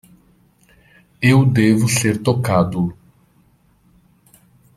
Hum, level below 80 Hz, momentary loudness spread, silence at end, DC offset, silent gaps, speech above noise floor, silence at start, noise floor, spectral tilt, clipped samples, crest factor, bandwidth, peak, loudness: none; -50 dBFS; 7 LU; 1.85 s; under 0.1%; none; 41 dB; 1.2 s; -56 dBFS; -6 dB/octave; under 0.1%; 18 dB; 14.5 kHz; -2 dBFS; -16 LUFS